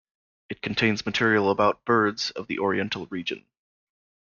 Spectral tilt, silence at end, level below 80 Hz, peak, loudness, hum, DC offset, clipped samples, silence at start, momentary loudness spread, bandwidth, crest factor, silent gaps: -5 dB/octave; 0.8 s; -60 dBFS; -8 dBFS; -25 LUFS; none; under 0.1%; under 0.1%; 0.5 s; 12 LU; 7.2 kHz; 18 dB; none